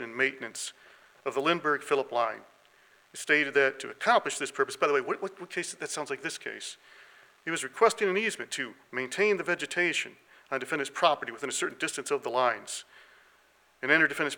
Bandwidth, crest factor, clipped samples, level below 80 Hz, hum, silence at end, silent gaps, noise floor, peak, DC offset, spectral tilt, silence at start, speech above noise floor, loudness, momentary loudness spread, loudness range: 17.5 kHz; 22 dB; under 0.1%; -84 dBFS; none; 0 s; none; -64 dBFS; -8 dBFS; under 0.1%; -2.5 dB/octave; 0 s; 34 dB; -29 LUFS; 13 LU; 3 LU